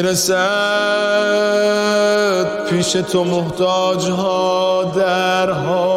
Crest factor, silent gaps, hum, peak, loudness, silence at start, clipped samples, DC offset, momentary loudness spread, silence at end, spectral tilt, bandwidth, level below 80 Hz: 10 dB; none; none; -6 dBFS; -16 LUFS; 0 s; under 0.1%; under 0.1%; 3 LU; 0 s; -4 dB/octave; 16 kHz; -54 dBFS